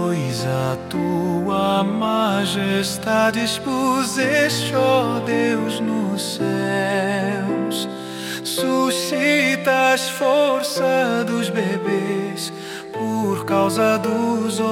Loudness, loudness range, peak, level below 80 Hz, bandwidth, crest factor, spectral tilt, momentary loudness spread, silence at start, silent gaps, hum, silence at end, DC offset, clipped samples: -20 LUFS; 3 LU; -6 dBFS; -62 dBFS; 17 kHz; 14 dB; -4.5 dB/octave; 7 LU; 0 s; none; none; 0 s; under 0.1%; under 0.1%